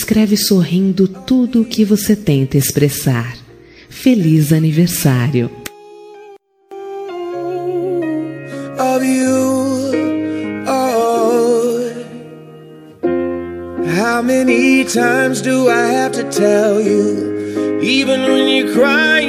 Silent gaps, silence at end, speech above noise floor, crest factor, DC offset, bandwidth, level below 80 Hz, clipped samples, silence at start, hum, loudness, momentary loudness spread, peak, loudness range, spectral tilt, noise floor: none; 0 s; 28 dB; 14 dB; under 0.1%; 15.5 kHz; -50 dBFS; under 0.1%; 0 s; none; -14 LUFS; 13 LU; 0 dBFS; 6 LU; -5.5 dB/octave; -41 dBFS